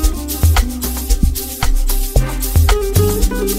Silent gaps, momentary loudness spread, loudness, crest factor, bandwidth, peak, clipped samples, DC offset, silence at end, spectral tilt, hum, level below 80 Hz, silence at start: none; 6 LU; -17 LUFS; 14 dB; 16.5 kHz; 0 dBFS; under 0.1%; under 0.1%; 0 s; -5 dB/octave; none; -16 dBFS; 0 s